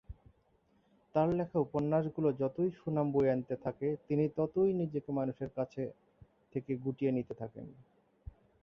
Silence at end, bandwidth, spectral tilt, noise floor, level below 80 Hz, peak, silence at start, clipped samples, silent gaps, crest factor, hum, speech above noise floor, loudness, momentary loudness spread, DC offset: 0.9 s; 6.6 kHz; -10.5 dB/octave; -71 dBFS; -62 dBFS; -16 dBFS; 0.1 s; under 0.1%; none; 18 dB; none; 38 dB; -34 LUFS; 12 LU; under 0.1%